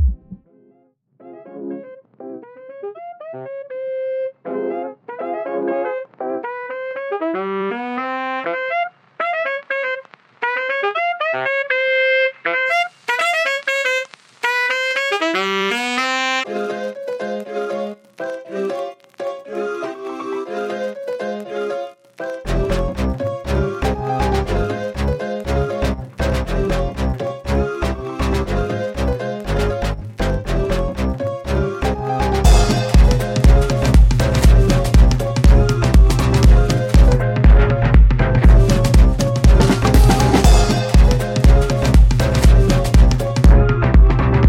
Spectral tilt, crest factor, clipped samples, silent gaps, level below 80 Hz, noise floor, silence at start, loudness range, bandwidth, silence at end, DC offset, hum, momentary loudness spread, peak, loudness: -6 dB/octave; 14 dB; under 0.1%; none; -18 dBFS; -57 dBFS; 0 s; 12 LU; 14 kHz; 0 s; under 0.1%; none; 14 LU; -2 dBFS; -17 LUFS